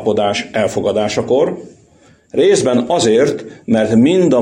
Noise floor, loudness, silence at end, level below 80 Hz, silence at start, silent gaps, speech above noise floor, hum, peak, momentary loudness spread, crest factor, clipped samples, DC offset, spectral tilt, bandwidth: -48 dBFS; -14 LUFS; 0 s; -52 dBFS; 0 s; none; 35 dB; none; -2 dBFS; 7 LU; 12 dB; under 0.1%; under 0.1%; -5 dB/octave; 10.5 kHz